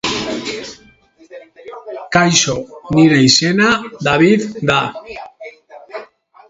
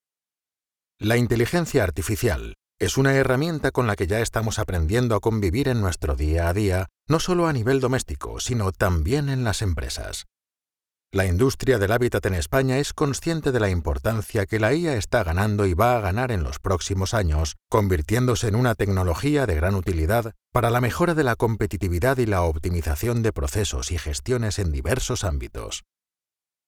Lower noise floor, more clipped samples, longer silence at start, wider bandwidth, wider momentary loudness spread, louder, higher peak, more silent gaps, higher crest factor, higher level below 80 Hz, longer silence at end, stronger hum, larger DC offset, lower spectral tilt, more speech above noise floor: second, -48 dBFS vs under -90 dBFS; neither; second, 0.05 s vs 1 s; second, 8 kHz vs 18 kHz; first, 22 LU vs 6 LU; first, -13 LUFS vs -23 LUFS; first, 0 dBFS vs -4 dBFS; neither; about the same, 16 dB vs 18 dB; second, -48 dBFS vs -36 dBFS; second, 0.45 s vs 0.9 s; neither; neither; second, -4 dB/octave vs -5.5 dB/octave; second, 34 dB vs over 68 dB